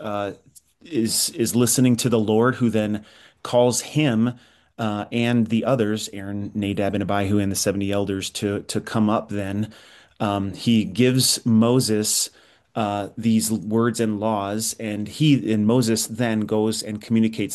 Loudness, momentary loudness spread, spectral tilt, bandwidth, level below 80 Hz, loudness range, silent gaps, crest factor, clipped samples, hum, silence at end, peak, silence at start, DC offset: -22 LUFS; 10 LU; -4.5 dB/octave; 12.5 kHz; -60 dBFS; 4 LU; none; 18 dB; under 0.1%; none; 0 s; -4 dBFS; 0 s; under 0.1%